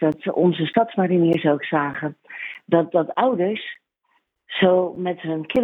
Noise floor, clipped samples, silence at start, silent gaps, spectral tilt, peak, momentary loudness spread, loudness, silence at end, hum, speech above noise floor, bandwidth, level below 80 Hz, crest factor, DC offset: -68 dBFS; under 0.1%; 0 s; none; -9 dB/octave; -2 dBFS; 13 LU; -21 LUFS; 0 s; none; 48 dB; 4.1 kHz; -64 dBFS; 18 dB; under 0.1%